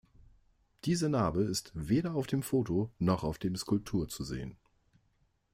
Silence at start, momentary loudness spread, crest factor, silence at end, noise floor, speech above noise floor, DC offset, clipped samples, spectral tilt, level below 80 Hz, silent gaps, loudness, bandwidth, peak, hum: 0.85 s; 9 LU; 18 dB; 1 s; -73 dBFS; 41 dB; under 0.1%; under 0.1%; -6 dB/octave; -54 dBFS; none; -33 LUFS; 16 kHz; -16 dBFS; none